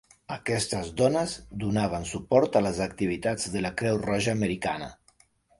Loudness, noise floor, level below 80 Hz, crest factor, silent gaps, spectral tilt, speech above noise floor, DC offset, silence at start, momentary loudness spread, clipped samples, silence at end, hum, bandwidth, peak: -27 LUFS; -64 dBFS; -50 dBFS; 20 dB; none; -5 dB/octave; 37 dB; under 0.1%; 0.3 s; 9 LU; under 0.1%; 0.65 s; none; 11.5 kHz; -8 dBFS